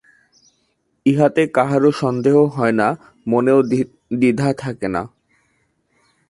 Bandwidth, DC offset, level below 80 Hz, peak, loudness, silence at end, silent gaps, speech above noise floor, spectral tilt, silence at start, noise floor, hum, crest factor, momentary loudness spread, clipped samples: 11.5 kHz; under 0.1%; -56 dBFS; -2 dBFS; -17 LUFS; 1.25 s; none; 50 dB; -7.5 dB/octave; 1.05 s; -66 dBFS; none; 16 dB; 9 LU; under 0.1%